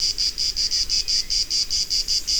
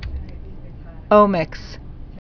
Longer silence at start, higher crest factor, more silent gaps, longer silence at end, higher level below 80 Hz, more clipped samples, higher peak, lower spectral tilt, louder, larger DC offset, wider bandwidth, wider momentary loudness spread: about the same, 0 s vs 0 s; second, 14 dB vs 20 dB; neither; about the same, 0 s vs 0.05 s; second, -40 dBFS vs -34 dBFS; neither; second, -10 dBFS vs 0 dBFS; second, 1.5 dB/octave vs -8 dB/octave; second, -20 LUFS vs -17 LUFS; neither; first, over 20 kHz vs 5.4 kHz; second, 2 LU vs 25 LU